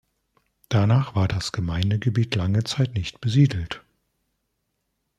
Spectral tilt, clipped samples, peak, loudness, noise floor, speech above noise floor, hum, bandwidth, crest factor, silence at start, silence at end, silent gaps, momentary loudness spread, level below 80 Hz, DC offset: -6.5 dB/octave; under 0.1%; -6 dBFS; -23 LUFS; -76 dBFS; 54 dB; none; 11.5 kHz; 18 dB; 0.7 s; 1.4 s; none; 7 LU; -48 dBFS; under 0.1%